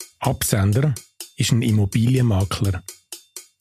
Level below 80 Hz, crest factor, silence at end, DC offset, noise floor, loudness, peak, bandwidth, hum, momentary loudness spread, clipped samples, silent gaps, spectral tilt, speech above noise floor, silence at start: -44 dBFS; 18 dB; 0.2 s; under 0.1%; -40 dBFS; -20 LUFS; -2 dBFS; 15.5 kHz; none; 18 LU; under 0.1%; none; -5.5 dB/octave; 21 dB; 0 s